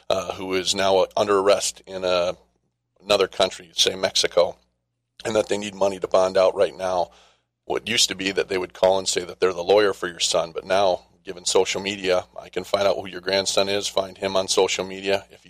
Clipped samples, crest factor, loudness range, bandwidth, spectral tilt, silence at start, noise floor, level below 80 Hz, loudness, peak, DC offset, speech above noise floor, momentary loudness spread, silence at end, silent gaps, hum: under 0.1%; 18 dB; 2 LU; 15.5 kHz; -2 dB/octave; 0.1 s; -75 dBFS; -58 dBFS; -22 LUFS; -4 dBFS; under 0.1%; 53 dB; 8 LU; 0.25 s; none; none